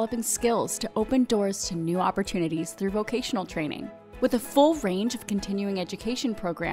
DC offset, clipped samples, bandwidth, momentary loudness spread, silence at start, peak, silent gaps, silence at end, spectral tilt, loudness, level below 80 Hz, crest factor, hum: under 0.1%; under 0.1%; 16 kHz; 8 LU; 0 s; -8 dBFS; none; 0 s; -4.5 dB/octave; -27 LUFS; -50 dBFS; 20 dB; none